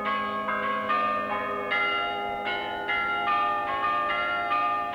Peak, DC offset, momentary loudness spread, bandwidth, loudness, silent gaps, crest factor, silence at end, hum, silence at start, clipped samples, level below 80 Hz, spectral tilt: -14 dBFS; under 0.1%; 4 LU; 18 kHz; -26 LUFS; none; 12 dB; 0 s; none; 0 s; under 0.1%; -60 dBFS; -4.5 dB/octave